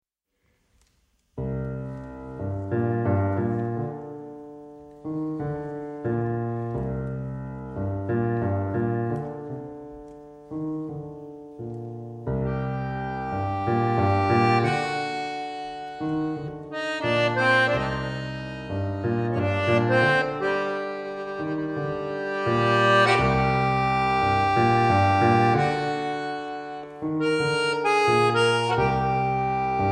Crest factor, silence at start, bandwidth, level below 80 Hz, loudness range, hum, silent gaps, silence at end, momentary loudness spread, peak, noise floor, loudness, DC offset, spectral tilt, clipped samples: 20 dB; 1.35 s; 10 kHz; -48 dBFS; 10 LU; none; none; 0 s; 16 LU; -6 dBFS; -73 dBFS; -25 LUFS; under 0.1%; -6.5 dB/octave; under 0.1%